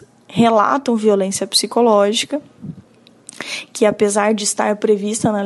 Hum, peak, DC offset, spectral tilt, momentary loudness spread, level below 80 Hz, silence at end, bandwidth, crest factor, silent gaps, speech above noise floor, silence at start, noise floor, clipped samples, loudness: none; -2 dBFS; under 0.1%; -3.5 dB/octave; 13 LU; -60 dBFS; 0 s; 12 kHz; 16 dB; none; 31 dB; 0.3 s; -47 dBFS; under 0.1%; -16 LUFS